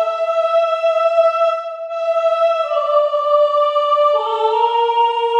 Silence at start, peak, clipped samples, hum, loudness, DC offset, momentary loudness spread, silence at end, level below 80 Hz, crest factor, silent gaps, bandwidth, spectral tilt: 0 s; -4 dBFS; under 0.1%; none; -16 LUFS; under 0.1%; 4 LU; 0 s; -88 dBFS; 12 dB; none; 8.4 kHz; 1 dB/octave